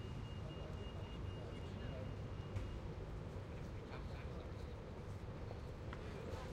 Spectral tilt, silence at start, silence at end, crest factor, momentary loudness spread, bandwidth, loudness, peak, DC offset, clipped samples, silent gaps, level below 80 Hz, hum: -7 dB/octave; 0 s; 0 s; 16 dB; 3 LU; 13 kHz; -49 LUFS; -32 dBFS; under 0.1%; under 0.1%; none; -54 dBFS; none